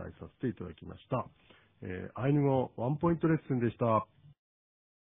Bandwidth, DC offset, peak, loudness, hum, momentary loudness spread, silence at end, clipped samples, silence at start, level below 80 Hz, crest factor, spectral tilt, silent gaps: 3.8 kHz; under 0.1%; -14 dBFS; -32 LUFS; none; 18 LU; 1 s; under 0.1%; 0 s; -62 dBFS; 18 dB; -12 dB/octave; none